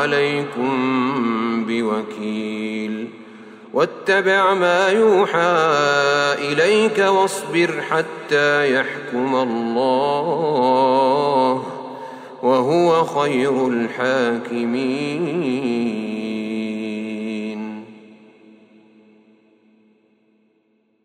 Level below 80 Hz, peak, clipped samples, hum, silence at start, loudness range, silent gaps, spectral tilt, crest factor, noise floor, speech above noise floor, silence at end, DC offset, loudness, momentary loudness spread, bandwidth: -70 dBFS; -4 dBFS; under 0.1%; none; 0 s; 11 LU; none; -5 dB/octave; 14 dB; -63 dBFS; 45 dB; 2.9 s; under 0.1%; -19 LUFS; 11 LU; 15.5 kHz